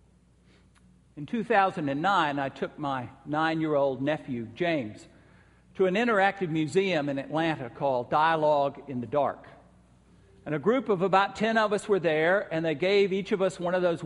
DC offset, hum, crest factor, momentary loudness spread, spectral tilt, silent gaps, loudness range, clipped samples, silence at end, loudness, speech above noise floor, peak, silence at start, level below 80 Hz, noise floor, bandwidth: under 0.1%; none; 20 dB; 9 LU; -6 dB/octave; none; 4 LU; under 0.1%; 0 s; -27 LUFS; 34 dB; -8 dBFS; 1.15 s; -64 dBFS; -60 dBFS; 11.5 kHz